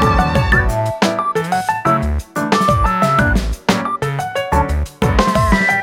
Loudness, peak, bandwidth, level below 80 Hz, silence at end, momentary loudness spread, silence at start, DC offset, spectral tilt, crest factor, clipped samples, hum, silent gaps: -16 LUFS; 0 dBFS; 16.5 kHz; -22 dBFS; 0 s; 6 LU; 0 s; under 0.1%; -5.5 dB/octave; 14 dB; under 0.1%; none; none